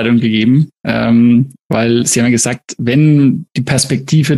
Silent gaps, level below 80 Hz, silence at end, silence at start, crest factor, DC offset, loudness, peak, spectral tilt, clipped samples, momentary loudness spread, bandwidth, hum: 1.62-1.69 s; -48 dBFS; 0 s; 0 s; 10 dB; under 0.1%; -12 LUFS; -2 dBFS; -5.5 dB/octave; under 0.1%; 7 LU; 12.5 kHz; none